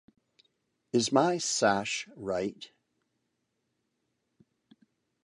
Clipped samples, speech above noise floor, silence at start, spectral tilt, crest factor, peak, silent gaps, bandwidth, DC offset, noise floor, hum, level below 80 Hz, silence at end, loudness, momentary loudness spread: under 0.1%; 51 dB; 0.95 s; -3.5 dB/octave; 24 dB; -10 dBFS; none; 11.5 kHz; under 0.1%; -80 dBFS; none; -70 dBFS; 2.55 s; -29 LUFS; 12 LU